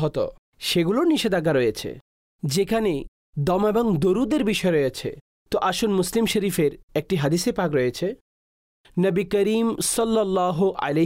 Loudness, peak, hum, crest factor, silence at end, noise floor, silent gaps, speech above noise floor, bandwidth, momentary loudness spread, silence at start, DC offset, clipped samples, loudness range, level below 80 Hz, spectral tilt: -23 LUFS; -12 dBFS; none; 10 dB; 0 s; under -90 dBFS; 0.38-0.52 s, 2.01-2.39 s, 3.08-3.33 s, 5.21-5.46 s, 6.83-6.88 s, 8.21-8.84 s; over 68 dB; 16 kHz; 10 LU; 0 s; under 0.1%; under 0.1%; 2 LU; -48 dBFS; -5 dB/octave